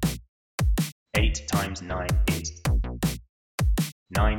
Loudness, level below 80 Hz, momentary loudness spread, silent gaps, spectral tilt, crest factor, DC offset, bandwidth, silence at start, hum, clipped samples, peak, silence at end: -27 LUFS; -28 dBFS; 6 LU; 0.29-0.58 s, 0.92-1.06 s, 3.29-3.58 s, 3.92-4.06 s; -5 dB/octave; 16 dB; under 0.1%; 18 kHz; 0 s; none; under 0.1%; -10 dBFS; 0 s